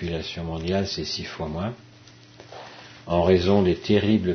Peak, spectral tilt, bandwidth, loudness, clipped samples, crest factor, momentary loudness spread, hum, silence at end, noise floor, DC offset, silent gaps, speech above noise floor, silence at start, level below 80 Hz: -6 dBFS; -6.5 dB/octave; 6.6 kHz; -24 LUFS; under 0.1%; 18 dB; 23 LU; none; 0 s; -49 dBFS; under 0.1%; none; 26 dB; 0 s; -46 dBFS